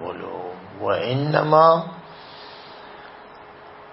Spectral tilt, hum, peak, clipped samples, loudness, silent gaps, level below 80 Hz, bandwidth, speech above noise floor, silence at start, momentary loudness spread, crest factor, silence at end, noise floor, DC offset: -10.5 dB/octave; none; -2 dBFS; under 0.1%; -20 LUFS; none; -64 dBFS; 5.8 kHz; 25 dB; 0 s; 28 LU; 22 dB; 0 s; -43 dBFS; under 0.1%